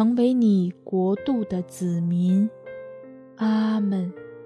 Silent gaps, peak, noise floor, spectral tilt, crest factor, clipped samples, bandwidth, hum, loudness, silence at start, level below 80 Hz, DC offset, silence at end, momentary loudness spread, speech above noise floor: none; -10 dBFS; -43 dBFS; -8.5 dB/octave; 14 dB; under 0.1%; 11 kHz; none; -23 LUFS; 0 s; -66 dBFS; under 0.1%; 0 s; 19 LU; 21 dB